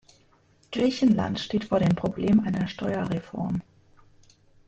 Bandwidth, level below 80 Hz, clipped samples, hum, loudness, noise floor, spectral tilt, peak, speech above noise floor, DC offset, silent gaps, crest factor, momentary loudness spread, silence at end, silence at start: 8.2 kHz; -54 dBFS; under 0.1%; none; -26 LUFS; -61 dBFS; -7 dB/octave; -12 dBFS; 37 dB; under 0.1%; none; 16 dB; 8 LU; 1.05 s; 0.7 s